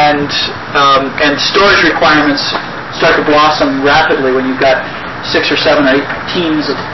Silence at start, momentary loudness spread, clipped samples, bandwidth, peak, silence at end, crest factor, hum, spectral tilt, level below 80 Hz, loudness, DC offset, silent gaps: 0 s; 7 LU; under 0.1%; 6.2 kHz; 0 dBFS; 0 s; 10 dB; none; -4.5 dB/octave; -38 dBFS; -10 LUFS; 1%; none